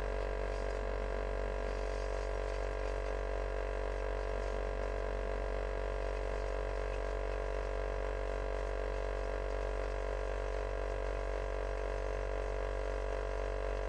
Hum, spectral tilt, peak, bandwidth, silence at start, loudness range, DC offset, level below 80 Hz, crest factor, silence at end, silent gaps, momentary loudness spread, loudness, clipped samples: none; -6 dB/octave; -24 dBFS; 9.2 kHz; 0 s; 0 LU; under 0.1%; -40 dBFS; 12 dB; 0 s; none; 0 LU; -39 LUFS; under 0.1%